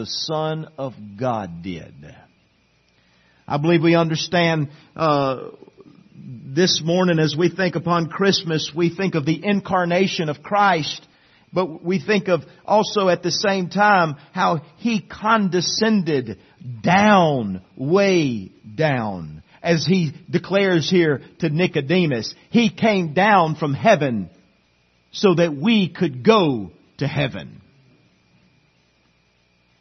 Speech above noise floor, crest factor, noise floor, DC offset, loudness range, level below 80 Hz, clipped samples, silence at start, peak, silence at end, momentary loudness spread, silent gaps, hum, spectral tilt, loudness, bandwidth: 42 dB; 20 dB; -61 dBFS; under 0.1%; 3 LU; -60 dBFS; under 0.1%; 0 s; -2 dBFS; 2.25 s; 13 LU; none; none; -5.5 dB/octave; -19 LUFS; 6.4 kHz